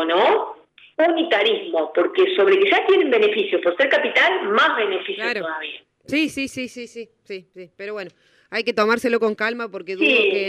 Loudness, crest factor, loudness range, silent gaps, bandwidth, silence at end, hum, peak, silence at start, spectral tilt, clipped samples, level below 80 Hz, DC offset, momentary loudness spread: -19 LUFS; 16 dB; 10 LU; none; 12.5 kHz; 0 s; none; -4 dBFS; 0 s; -3.5 dB/octave; under 0.1%; -68 dBFS; under 0.1%; 18 LU